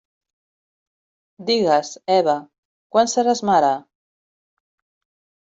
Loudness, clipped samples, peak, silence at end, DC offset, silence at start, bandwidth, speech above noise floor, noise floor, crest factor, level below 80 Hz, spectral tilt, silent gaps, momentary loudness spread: -19 LUFS; under 0.1%; -4 dBFS; 1.75 s; under 0.1%; 1.4 s; 8 kHz; over 72 dB; under -90 dBFS; 18 dB; -68 dBFS; -3.5 dB/octave; 2.58-2.90 s; 7 LU